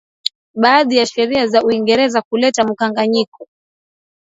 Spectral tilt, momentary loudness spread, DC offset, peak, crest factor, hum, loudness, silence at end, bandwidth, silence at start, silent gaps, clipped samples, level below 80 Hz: -3.5 dB/octave; 10 LU; under 0.1%; 0 dBFS; 16 dB; none; -15 LUFS; 0.85 s; 8 kHz; 0.25 s; 0.35-0.54 s, 2.25-2.31 s, 3.28-3.32 s; under 0.1%; -58 dBFS